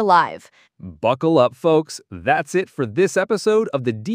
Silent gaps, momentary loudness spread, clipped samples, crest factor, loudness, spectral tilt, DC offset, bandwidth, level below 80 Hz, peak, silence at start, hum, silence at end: none; 9 LU; under 0.1%; 18 dB; -19 LUFS; -5.5 dB/octave; under 0.1%; 15.5 kHz; -60 dBFS; -2 dBFS; 0 s; none; 0 s